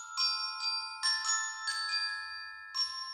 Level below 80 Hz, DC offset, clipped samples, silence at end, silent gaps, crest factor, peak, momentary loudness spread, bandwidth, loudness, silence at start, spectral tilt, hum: -82 dBFS; under 0.1%; under 0.1%; 0 s; none; 16 dB; -20 dBFS; 8 LU; 16.5 kHz; -32 LUFS; 0 s; 5.5 dB/octave; none